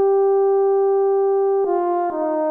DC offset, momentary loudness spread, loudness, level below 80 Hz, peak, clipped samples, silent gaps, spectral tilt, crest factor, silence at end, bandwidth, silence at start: under 0.1%; 5 LU; -18 LUFS; -70 dBFS; -10 dBFS; under 0.1%; none; -8.5 dB/octave; 8 dB; 0 s; 2.2 kHz; 0 s